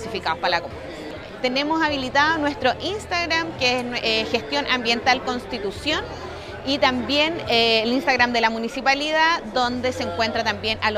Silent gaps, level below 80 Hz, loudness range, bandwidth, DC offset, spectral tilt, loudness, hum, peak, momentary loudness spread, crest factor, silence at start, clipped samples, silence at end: none; -46 dBFS; 3 LU; 15.5 kHz; under 0.1%; -3.5 dB/octave; -21 LUFS; none; -2 dBFS; 9 LU; 20 dB; 0 s; under 0.1%; 0 s